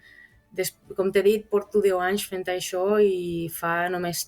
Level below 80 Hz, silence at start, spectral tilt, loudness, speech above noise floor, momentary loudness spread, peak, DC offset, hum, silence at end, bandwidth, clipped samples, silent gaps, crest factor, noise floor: -60 dBFS; 0.55 s; -4 dB/octave; -25 LUFS; 29 dB; 9 LU; -10 dBFS; under 0.1%; none; 0 s; 19 kHz; under 0.1%; none; 16 dB; -53 dBFS